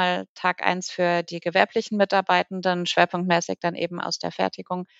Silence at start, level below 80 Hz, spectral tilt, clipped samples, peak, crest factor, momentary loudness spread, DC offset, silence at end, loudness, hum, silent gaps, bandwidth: 0 s; -74 dBFS; -4 dB/octave; under 0.1%; -2 dBFS; 22 dB; 7 LU; under 0.1%; 0.15 s; -24 LUFS; none; 0.29-0.36 s; 8 kHz